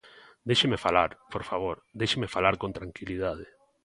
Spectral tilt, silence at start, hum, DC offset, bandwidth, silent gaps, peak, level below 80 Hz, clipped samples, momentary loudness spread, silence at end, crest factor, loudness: -4.5 dB/octave; 0.05 s; none; under 0.1%; 11.5 kHz; none; -6 dBFS; -52 dBFS; under 0.1%; 14 LU; 0.4 s; 24 dB; -28 LUFS